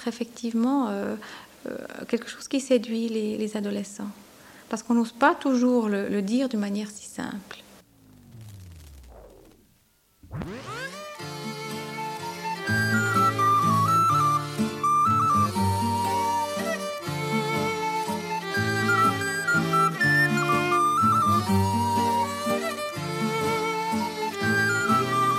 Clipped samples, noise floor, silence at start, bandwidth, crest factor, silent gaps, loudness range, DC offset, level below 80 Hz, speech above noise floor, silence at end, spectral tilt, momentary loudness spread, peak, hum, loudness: under 0.1%; -64 dBFS; 0 s; 16.5 kHz; 20 dB; none; 15 LU; under 0.1%; -60 dBFS; 37 dB; 0 s; -5 dB/octave; 15 LU; -6 dBFS; none; -24 LUFS